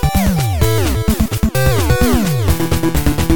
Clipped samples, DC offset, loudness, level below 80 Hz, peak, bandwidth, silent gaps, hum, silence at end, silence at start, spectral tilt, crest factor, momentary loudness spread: under 0.1%; 6%; -15 LUFS; -20 dBFS; 0 dBFS; 17.5 kHz; none; none; 0 s; 0 s; -5.5 dB/octave; 14 dB; 3 LU